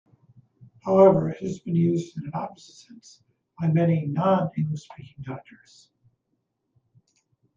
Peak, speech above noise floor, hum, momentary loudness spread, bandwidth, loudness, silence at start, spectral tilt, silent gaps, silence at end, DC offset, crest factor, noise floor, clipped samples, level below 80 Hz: -6 dBFS; 53 dB; none; 20 LU; 7.4 kHz; -23 LUFS; 0.85 s; -9 dB/octave; none; 2.2 s; under 0.1%; 20 dB; -77 dBFS; under 0.1%; -64 dBFS